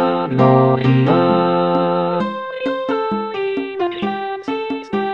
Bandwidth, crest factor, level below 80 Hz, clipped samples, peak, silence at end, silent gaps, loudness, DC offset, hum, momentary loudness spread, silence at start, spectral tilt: 6 kHz; 16 dB; -56 dBFS; under 0.1%; -2 dBFS; 0 s; none; -17 LUFS; 0.2%; none; 10 LU; 0 s; -9 dB/octave